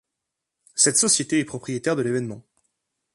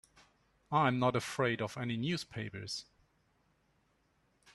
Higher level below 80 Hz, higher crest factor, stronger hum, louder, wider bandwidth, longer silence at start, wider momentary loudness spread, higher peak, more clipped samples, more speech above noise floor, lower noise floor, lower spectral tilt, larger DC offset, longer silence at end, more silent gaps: about the same, -66 dBFS vs -70 dBFS; about the same, 22 dB vs 22 dB; neither; first, -21 LUFS vs -35 LUFS; about the same, 12 kHz vs 12.5 kHz; about the same, 0.75 s vs 0.7 s; first, 15 LU vs 12 LU; first, -4 dBFS vs -14 dBFS; neither; first, 60 dB vs 40 dB; first, -83 dBFS vs -74 dBFS; second, -2.5 dB/octave vs -5.5 dB/octave; neither; second, 0.75 s vs 1.7 s; neither